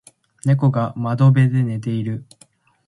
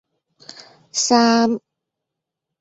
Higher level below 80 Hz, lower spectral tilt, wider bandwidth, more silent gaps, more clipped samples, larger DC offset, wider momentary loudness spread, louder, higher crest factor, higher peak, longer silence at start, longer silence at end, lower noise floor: first, -58 dBFS vs -66 dBFS; first, -8.5 dB/octave vs -2.5 dB/octave; first, 11.5 kHz vs 8 kHz; neither; neither; neither; about the same, 11 LU vs 12 LU; about the same, -19 LUFS vs -17 LUFS; about the same, 16 dB vs 18 dB; about the same, -4 dBFS vs -2 dBFS; second, 0.45 s vs 0.95 s; second, 0.65 s vs 1.05 s; second, -54 dBFS vs -82 dBFS